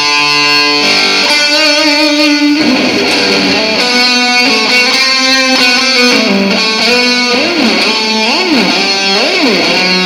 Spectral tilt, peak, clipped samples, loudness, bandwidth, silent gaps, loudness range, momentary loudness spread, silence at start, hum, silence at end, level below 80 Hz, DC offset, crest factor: -2 dB/octave; 0 dBFS; 0.4%; -7 LUFS; 16.5 kHz; none; 1 LU; 3 LU; 0 s; none; 0 s; -50 dBFS; under 0.1%; 8 dB